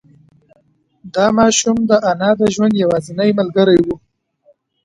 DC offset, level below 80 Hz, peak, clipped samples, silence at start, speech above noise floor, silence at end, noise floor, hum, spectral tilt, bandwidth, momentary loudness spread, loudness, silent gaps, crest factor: under 0.1%; -50 dBFS; 0 dBFS; under 0.1%; 1.05 s; 47 dB; 0.9 s; -61 dBFS; none; -4.5 dB/octave; 11 kHz; 5 LU; -14 LUFS; none; 16 dB